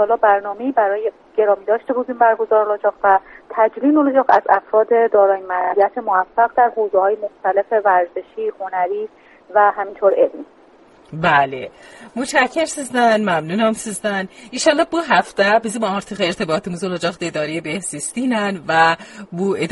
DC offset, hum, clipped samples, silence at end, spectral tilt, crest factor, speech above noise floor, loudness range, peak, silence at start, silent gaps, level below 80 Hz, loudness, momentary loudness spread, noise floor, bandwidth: under 0.1%; none; under 0.1%; 0 s; -4.5 dB/octave; 16 dB; 31 dB; 4 LU; 0 dBFS; 0 s; none; -58 dBFS; -17 LUFS; 9 LU; -48 dBFS; 11.5 kHz